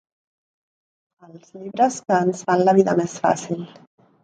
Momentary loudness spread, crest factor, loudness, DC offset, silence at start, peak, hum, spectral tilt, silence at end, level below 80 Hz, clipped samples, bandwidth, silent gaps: 16 LU; 20 dB; -20 LUFS; under 0.1%; 1.35 s; -2 dBFS; none; -6 dB/octave; 0.6 s; -68 dBFS; under 0.1%; 9.4 kHz; none